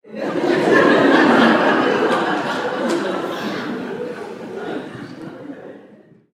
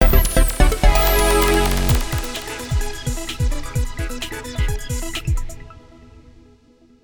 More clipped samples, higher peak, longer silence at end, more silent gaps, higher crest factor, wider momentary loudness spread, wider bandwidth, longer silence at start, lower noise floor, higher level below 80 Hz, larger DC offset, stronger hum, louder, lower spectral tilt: neither; about the same, 0 dBFS vs 0 dBFS; second, 0.5 s vs 1.25 s; neither; about the same, 18 dB vs 18 dB; first, 21 LU vs 12 LU; second, 14.5 kHz vs 20 kHz; about the same, 0.05 s vs 0 s; second, -47 dBFS vs -52 dBFS; second, -62 dBFS vs -20 dBFS; neither; neither; first, -17 LUFS vs -20 LUFS; about the same, -5.5 dB/octave vs -4.5 dB/octave